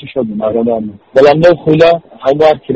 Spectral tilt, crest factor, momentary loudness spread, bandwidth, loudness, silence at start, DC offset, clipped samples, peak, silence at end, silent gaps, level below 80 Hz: -7.5 dB/octave; 10 dB; 9 LU; 8 kHz; -10 LUFS; 0 s; under 0.1%; 0.4%; 0 dBFS; 0 s; none; -44 dBFS